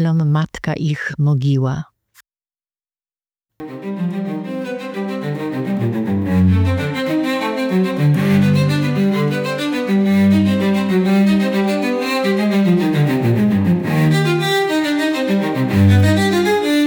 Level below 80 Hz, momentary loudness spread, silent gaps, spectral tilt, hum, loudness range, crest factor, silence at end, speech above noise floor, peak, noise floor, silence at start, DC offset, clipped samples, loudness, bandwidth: -48 dBFS; 10 LU; none; -7 dB/octave; none; 9 LU; 14 dB; 0 s; over 73 dB; -2 dBFS; under -90 dBFS; 0 s; under 0.1%; under 0.1%; -16 LUFS; 19.5 kHz